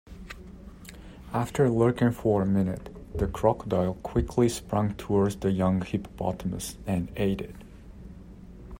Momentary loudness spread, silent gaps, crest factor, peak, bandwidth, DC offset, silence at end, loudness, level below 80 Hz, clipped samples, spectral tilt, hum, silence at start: 22 LU; none; 20 dB; -8 dBFS; 16 kHz; under 0.1%; 0 s; -27 LUFS; -44 dBFS; under 0.1%; -7 dB/octave; none; 0.05 s